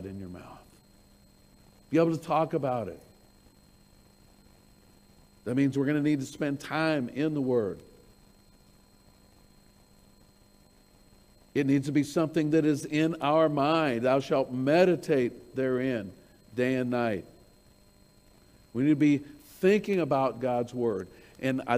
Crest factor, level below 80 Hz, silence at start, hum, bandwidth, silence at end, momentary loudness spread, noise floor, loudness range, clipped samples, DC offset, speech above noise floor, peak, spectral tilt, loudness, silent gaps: 20 dB; -64 dBFS; 0 s; none; 15.5 kHz; 0 s; 13 LU; -60 dBFS; 9 LU; under 0.1%; under 0.1%; 33 dB; -10 dBFS; -7 dB/octave; -28 LUFS; none